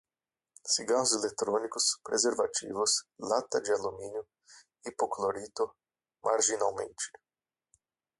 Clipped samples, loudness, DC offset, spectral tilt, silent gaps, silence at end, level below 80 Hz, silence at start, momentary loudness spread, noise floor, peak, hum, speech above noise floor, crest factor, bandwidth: under 0.1%; -31 LUFS; under 0.1%; -1 dB/octave; none; 1.1 s; -72 dBFS; 0.65 s; 12 LU; under -90 dBFS; -12 dBFS; none; over 59 dB; 20 dB; 11.5 kHz